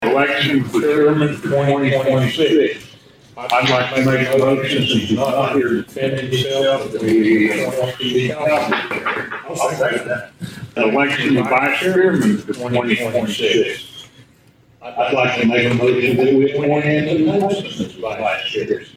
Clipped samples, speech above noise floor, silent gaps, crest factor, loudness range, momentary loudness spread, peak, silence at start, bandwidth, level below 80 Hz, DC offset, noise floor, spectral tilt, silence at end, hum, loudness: under 0.1%; 34 dB; none; 14 dB; 3 LU; 8 LU; -2 dBFS; 0 s; 16.5 kHz; -54 dBFS; under 0.1%; -51 dBFS; -5.5 dB/octave; 0.05 s; none; -17 LUFS